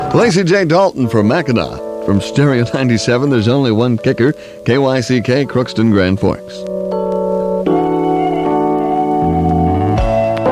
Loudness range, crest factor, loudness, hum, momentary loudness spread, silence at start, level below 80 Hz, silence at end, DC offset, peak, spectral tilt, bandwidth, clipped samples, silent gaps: 2 LU; 12 dB; -14 LUFS; none; 5 LU; 0 s; -32 dBFS; 0 s; under 0.1%; 0 dBFS; -6.5 dB/octave; 13 kHz; under 0.1%; none